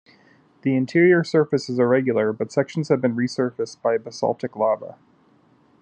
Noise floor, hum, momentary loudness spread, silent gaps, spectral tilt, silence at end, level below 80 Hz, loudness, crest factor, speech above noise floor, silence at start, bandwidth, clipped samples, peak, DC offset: -58 dBFS; none; 9 LU; none; -7 dB/octave; 0.9 s; -74 dBFS; -21 LUFS; 16 dB; 37 dB; 0.65 s; 9 kHz; under 0.1%; -6 dBFS; under 0.1%